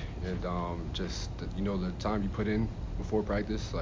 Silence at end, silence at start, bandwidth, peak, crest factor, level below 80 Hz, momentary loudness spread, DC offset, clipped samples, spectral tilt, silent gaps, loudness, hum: 0 s; 0 s; 7.6 kHz; -18 dBFS; 16 dB; -40 dBFS; 5 LU; under 0.1%; under 0.1%; -6.5 dB/octave; none; -34 LUFS; none